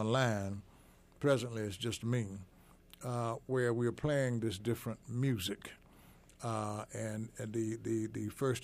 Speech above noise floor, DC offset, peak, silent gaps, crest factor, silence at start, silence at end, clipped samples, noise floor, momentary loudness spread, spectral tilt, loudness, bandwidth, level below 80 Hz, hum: 26 dB; under 0.1%; -18 dBFS; none; 18 dB; 0 s; 0 s; under 0.1%; -62 dBFS; 10 LU; -6 dB/octave; -37 LUFS; 15.5 kHz; -64 dBFS; none